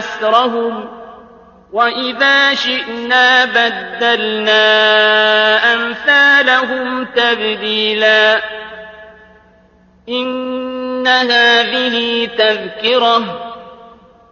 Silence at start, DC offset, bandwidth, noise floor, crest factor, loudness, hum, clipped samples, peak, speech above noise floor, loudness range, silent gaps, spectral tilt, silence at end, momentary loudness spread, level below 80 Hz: 0 s; under 0.1%; 7.2 kHz; -48 dBFS; 14 dB; -12 LUFS; none; under 0.1%; 0 dBFS; 36 dB; 6 LU; none; -2.5 dB/octave; 0.45 s; 12 LU; -56 dBFS